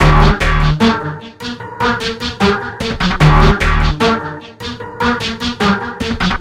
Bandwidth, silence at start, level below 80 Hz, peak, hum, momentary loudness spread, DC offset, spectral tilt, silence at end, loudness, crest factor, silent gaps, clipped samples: 12.5 kHz; 0 s; -20 dBFS; 0 dBFS; none; 15 LU; under 0.1%; -6 dB/octave; 0 s; -14 LUFS; 14 dB; none; under 0.1%